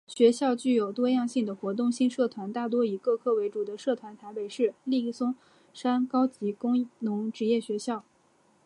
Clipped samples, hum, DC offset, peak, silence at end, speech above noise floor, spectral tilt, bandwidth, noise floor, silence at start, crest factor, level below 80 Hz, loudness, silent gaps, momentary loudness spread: under 0.1%; none; under 0.1%; -10 dBFS; 0.65 s; 37 dB; -5.5 dB/octave; 11 kHz; -65 dBFS; 0.1 s; 18 dB; -82 dBFS; -28 LUFS; none; 8 LU